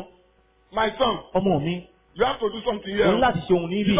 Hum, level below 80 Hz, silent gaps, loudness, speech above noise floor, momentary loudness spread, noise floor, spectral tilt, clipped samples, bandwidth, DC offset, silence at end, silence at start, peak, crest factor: none; -48 dBFS; none; -23 LUFS; 38 dB; 8 LU; -61 dBFS; -10 dB/octave; under 0.1%; 4 kHz; under 0.1%; 0 s; 0 s; -8 dBFS; 16 dB